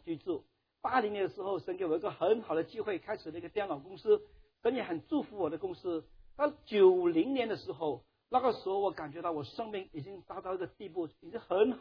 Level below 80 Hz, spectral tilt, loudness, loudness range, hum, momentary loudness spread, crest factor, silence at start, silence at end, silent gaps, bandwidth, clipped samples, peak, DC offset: -68 dBFS; -4.5 dB/octave; -34 LUFS; 5 LU; none; 11 LU; 20 dB; 0.05 s; 0 s; none; 5.4 kHz; under 0.1%; -14 dBFS; under 0.1%